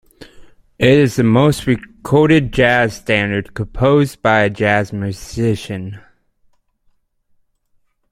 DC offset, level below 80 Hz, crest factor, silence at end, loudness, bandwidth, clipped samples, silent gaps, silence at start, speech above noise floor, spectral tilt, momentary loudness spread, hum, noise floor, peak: under 0.1%; -40 dBFS; 16 dB; 2.15 s; -15 LUFS; 15.5 kHz; under 0.1%; none; 0.2 s; 46 dB; -6.5 dB/octave; 12 LU; none; -61 dBFS; 0 dBFS